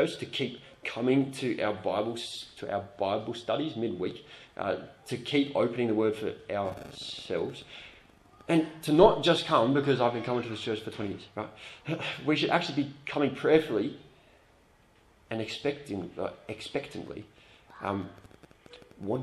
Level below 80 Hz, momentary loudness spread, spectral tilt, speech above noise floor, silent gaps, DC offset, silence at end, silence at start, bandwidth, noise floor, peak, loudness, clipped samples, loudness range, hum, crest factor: -60 dBFS; 15 LU; -6 dB/octave; 32 dB; none; under 0.1%; 0 s; 0 s; 13 kHz; -62 dBFS; -6 dBFS; -30 LUFS; under 0.1%; 11 LU; none; 26 dB